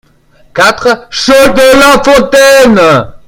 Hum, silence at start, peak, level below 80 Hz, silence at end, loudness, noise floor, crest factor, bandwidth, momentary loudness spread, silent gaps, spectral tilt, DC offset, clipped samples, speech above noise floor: none; 0.55 s; 0 dBFS; -32 dBFS; 0.1 s; -5 LUFS; -43 dBFS; 6 dB; over 20 kHz; 8 LU; none; -3.5 dB/octave; under 0.1%; 6%; 38 dB